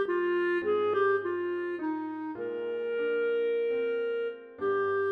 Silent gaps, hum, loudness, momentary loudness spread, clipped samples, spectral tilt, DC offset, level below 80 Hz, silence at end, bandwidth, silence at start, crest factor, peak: none; none; -30 LUFS; 8 LU; under 0.1%; -7 dB/octave; under 0.1%; -78 dBFS; 0 s; 5 kHz; 0 s; 12 dB; -18 dBFS